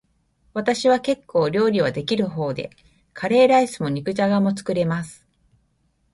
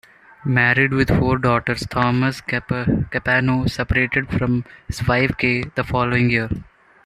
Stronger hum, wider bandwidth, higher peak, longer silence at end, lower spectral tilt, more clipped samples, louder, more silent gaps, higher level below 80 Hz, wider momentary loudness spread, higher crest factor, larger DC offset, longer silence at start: neither; second, 11.5 kHz vs 13.5 kHz; about the same, -4 dBFS vs -2 dBFS; first, 1 s vs 0.4 s; about the same, -6 dB/octave vs -6.5 dB/octave; neither; about the same, -21 LUFS vs -19 LUFS; neither; second, -58 dBFS vs -38 dBFS; first, 13 LU vs 8 LU; about the same, 16 dB vs 18 dB; neither; about the same, 0.55 s vs 0.45 s